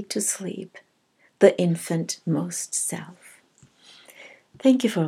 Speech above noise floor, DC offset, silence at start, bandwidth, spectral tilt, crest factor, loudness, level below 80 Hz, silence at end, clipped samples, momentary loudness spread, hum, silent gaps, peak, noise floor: 41 dB; under 0.1%; 0 s; 16.5 kHz; -5 dB/octave; 22 dB; -23 LUFS; -80 dBFS; 0 s; under 0.1%; 23 LU; none; none; -2 dBFS; -64 dBFS